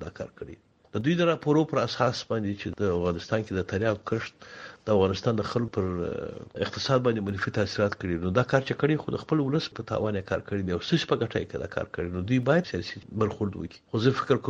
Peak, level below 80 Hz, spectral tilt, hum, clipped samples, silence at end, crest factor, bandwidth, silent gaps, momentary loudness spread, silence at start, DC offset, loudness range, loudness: -8 dBFS; -54 dBFS; -6.5 dB/octave; none; under 0.1%; 0 s; 20 dB; 8 kHz; none; 10 LU; 0 s; under 0.1%; 2 LU; -28 LUFS